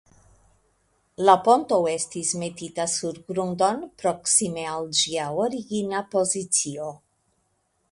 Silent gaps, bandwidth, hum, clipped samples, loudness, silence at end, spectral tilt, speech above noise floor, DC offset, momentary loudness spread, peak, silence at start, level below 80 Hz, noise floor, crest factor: none; 11.5 kHz; none; under 0.1%; -23 LUFS; 0.95 s; -3 dB/octave; 47 dB; under 0.1%; 10 LU; -2 dBFS; 1.2 s; -64 dBFS; -71 dBFS; 24 dB